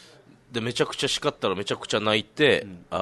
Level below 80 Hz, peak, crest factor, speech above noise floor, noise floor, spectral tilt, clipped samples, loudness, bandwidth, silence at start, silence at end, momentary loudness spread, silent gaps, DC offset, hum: -60 dBFS; -6 dBFS; 20 dB; 27 dB; -52 dBFS; -3.5 dB/octave; under 0.1%; -25 LUFS; 12 kHz; 0.5 s; 0 s; 9 LU; none; under 0.1%; none